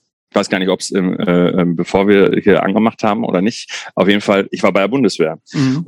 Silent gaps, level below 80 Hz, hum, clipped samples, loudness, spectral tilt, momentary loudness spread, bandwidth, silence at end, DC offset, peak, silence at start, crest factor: none; -54 dBFS; none; under 0.1%; -14 LUFS; -6 dB/octave; 7 LU; 15.5 kHz; 0 s; under 0.1%; 0 dBFS; 0.35 s; 14 dB